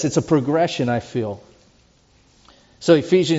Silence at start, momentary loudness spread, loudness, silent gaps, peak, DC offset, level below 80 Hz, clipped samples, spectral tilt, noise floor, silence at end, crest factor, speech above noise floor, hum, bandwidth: 0 s; 12 LU; -19 LUFS; none; -2 dBFS; under 0.1%; -56 dBFS; under 0.1%; -5.5 dB/octave; -56 dBFS; 0 s; 18 dB; 38 dB; none; 8 kHz